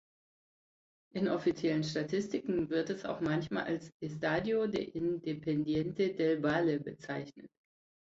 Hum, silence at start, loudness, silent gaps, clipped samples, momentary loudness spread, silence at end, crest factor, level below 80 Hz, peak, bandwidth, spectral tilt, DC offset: none; 1.15 s; -34 LUFS; 3.94-4.00 s; under 0.1%; 9 LU; 0.7 s; 16 dB; -66 dBFS; -18 dBFS; 7.8 kHz; -6.5 dB/octave; under 0.1%